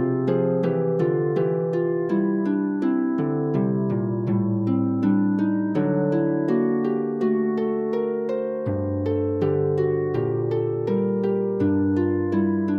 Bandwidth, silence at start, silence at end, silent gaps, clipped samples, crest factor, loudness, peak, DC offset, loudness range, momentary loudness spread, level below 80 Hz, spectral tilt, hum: 5.6 kHz; 0 s; 0 s; none; under 0.1%; 12 dB; -23 LUFS; -10 dBFS; under 0.1%; 2 LU; 3 LU; -62 dBFS; -11 dB/octave; none